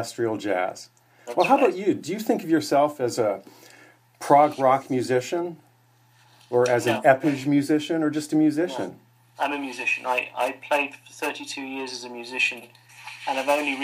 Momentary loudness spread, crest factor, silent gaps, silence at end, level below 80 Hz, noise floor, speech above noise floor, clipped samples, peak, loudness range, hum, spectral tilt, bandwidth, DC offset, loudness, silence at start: 13 LU; 22 dB; none; 0 s; -76 dBFS; -59 dBFS; 36 dB; under 0.1%; -4 dBFS; 5 LU; none; -5 dB/octave; 15.5 kHz; under 0.1%; -24 LUFS; 0 s